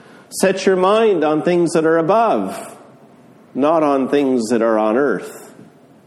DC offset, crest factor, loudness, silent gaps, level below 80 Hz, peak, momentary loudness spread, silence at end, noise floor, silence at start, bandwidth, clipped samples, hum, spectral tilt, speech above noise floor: under 0.1%; 16 dB; -16 LUFS; none; -64 dBFS; 0 dBFS; 13 LU; 0.55 s; -46 dBFS; 0.3 s; 13 kHz; under 0.1%; none; -5.5 dB/octave; 30 dB